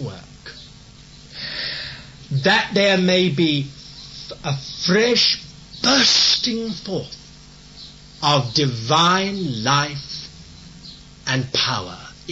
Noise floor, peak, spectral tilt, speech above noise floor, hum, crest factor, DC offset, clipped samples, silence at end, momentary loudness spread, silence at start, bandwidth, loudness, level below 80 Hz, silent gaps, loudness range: -43 dBFS; -4 dBFS; -3.5 dB/octave; 25 dB; none; 18 dB; under 0.1%; under 0.1%; 0 s; 23 LU; 0 s; 8 kHz; -18 LUFS; -50 dBFS; none; 3 LU